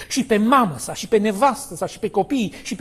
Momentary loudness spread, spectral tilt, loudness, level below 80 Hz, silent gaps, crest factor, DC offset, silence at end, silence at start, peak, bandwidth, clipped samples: 11 LU; -4.5 dB/octave; -20 LUFS; -52 dBFS; none; 16 dB; under 0.1%; 0 s; 0 s; -4 dBFS; 14 kHz; under 0.1%